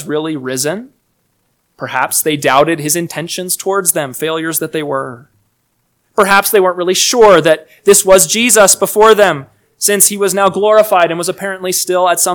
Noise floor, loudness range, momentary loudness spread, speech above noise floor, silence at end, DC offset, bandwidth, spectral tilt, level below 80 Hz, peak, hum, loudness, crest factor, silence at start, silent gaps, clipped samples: -62 dBFS; 7 LU; 12 LU; 51 dB; 0 s; under 0.1%; over 20 kHz; -2.5 dB/octave; -48 dBFS; 0 dBFS; none; -11 LUFS; 12 dB; 0 s; none; 1%